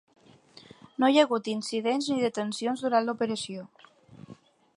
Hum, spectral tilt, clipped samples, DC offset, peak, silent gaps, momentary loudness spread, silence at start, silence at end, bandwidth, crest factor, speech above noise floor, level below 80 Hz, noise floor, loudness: none; -4 dB/octave; under 0.1%; under 0.1%; -8 dBFS; none; 12 LU; 1 s; 0.45 s; 11.5 kHz; 22 dB; 28 dB; -78 dBFS; -55 dBFS; -27 LUFS